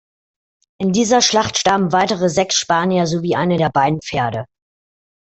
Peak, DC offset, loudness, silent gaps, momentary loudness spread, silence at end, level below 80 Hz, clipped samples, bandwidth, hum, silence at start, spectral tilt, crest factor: -2 dBFS; under 0.1%; -16 LUFS; none; 8 LU; 0.8 s; -52 dBFS; under 0.1%; 8.4 kHz; none; 0.8 s; -4 dB/octave; 16 dB